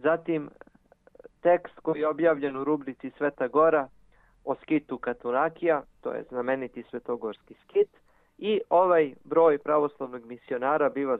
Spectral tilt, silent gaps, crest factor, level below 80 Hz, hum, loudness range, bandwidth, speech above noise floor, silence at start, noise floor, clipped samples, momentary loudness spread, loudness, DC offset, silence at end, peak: -9 dB/octave; none; 18 dB; -66 dBFS; none; 5 LU; 4 kHz; 34 dB; 0.05 s; -60 dBFS; under 0.1%; 15 LU; -27 LUFS; under 0.1%; 0 s; -10 dBFS